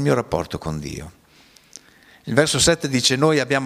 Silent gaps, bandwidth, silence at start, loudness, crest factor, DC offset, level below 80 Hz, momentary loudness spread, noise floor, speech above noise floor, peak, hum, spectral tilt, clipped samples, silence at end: none; 15.5 kHz; 0 s; -19 LUFS; 22 dB; under 0.1%; -44 dBFS; 16 LU; -52 dBFS; 33 dB; 0 dBFS; none; -3.5 dB/octave; under 0.1%; 0 s